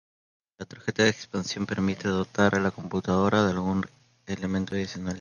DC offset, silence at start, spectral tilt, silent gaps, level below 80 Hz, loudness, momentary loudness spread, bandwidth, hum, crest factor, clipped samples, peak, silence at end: under 0.1%; 0.6 s; -5.5 dB/octave; none; -52 dBFS; -27 LUFS; 11 LU; 9.4 kHz; none; 20 dB; under 0.1%; -8 dBFS; 0 s